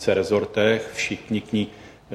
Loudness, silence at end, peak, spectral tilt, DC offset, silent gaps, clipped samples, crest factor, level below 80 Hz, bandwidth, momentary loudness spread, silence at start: -23 LUFS; 0 s; -6 dBFS; -5 dB/octave; under 0.1%; none; under 0.1%; 18 dB; -56 dBFS; 14 kHz; 7 LU; 0 s